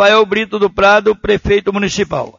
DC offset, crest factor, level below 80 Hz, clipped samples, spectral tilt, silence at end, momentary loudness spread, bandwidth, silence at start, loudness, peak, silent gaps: under 0.1%; 12 dB; -34 dBFS; under 0.1%; -4.5 dB/octave; 0.1 s; 6 LU; 7.6 kHz; 0 s; -13 LUFS; 0 dBFS; none